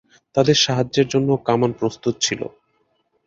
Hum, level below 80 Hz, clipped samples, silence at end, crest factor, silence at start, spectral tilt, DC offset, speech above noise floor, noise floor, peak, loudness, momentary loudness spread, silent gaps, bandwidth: none; -56 dBFS; under 0.1%; 0.8 s; 18 dB; 0.35 s; -4.5 dB/octave; under 0.1%; 47 dB; -66 dBFS; -2 dBFS; -19 LUFS; 9 LU; none; 7.8 kHz